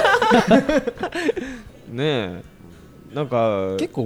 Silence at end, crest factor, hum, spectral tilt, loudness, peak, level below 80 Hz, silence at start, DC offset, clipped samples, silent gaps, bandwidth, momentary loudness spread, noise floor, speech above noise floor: 0 s; 20 dB; none; -5.5 dB/octave; -20 LUFS; 0 dBFS; -46 dBFS; 0 s; under 0.1%; under 0.1%; none; 17 kHz; 19 LU; -44 dBFS; 23 dB